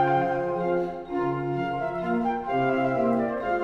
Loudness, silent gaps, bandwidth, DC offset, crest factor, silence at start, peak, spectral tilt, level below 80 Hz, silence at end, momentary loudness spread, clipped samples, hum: -26 LUFS; none; 7.2 kHz; under 0.1%; 14 dB; 0 s; -12 dBFS; -8.5 dB/octave; -54 dBFS; 0 s; 5 LU; under 0.1%; none